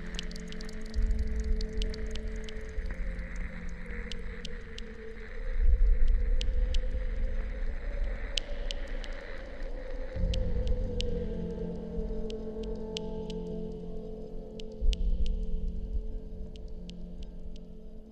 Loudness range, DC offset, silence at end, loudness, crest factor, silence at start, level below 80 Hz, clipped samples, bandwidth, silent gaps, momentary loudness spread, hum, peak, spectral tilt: 5 LU; under 0.1%; 0 s; -37 LUFS; 24 dB; 0 s; -32 dBFS; under 0.1%; 8.6 kHz; none; 11 LU; none; -8 dBFS; -5.5 dB/octave